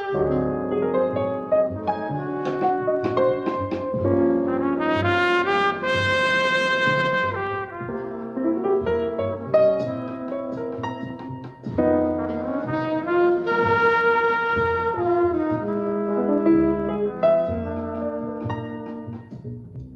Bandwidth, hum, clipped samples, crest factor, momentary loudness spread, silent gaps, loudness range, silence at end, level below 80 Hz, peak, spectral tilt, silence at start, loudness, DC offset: 8.8 kHz; none; under 0.1%; 16 dB; 11 LU; none; 4 LU; 0 s; -52 dBFS; -6 dBFS; -7 dB/octave; 0 s; -22 LUFS; under 0.1%